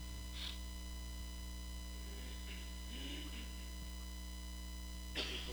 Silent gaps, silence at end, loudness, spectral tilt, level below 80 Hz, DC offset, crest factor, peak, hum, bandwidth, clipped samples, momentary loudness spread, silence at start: none; 0 s; -47 LUFS; -3.5 dB/octave; -48 dBFS; under 0.1%; 20 dB; -26 dBFS; 60 Hz at -50 dBFS; over 20 kHz; under 0.1%; 5 LU; 0 s